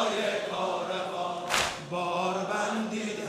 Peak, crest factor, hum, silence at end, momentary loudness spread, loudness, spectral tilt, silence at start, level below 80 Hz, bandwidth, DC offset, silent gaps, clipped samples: -10 dBFS; 20 dB; none; 0 s; 5 LU; -30 LUFS; -3 dB/octave; 0 s; -62 dBFS; 15.5 kHz; under 0.1%; none; under 0.1%